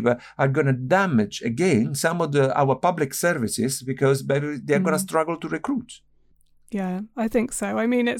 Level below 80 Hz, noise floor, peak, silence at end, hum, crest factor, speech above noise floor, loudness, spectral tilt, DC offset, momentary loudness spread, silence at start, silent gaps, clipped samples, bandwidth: -58 dBFS; -58 dBFS; -8 dBFS; 0 s; none; 14 dB; 36 dB; -23 LUFS; -5.5 dB/octave; under 0.1%; 8 LU; 0 s; none; under 0.1%; 17.5 kHz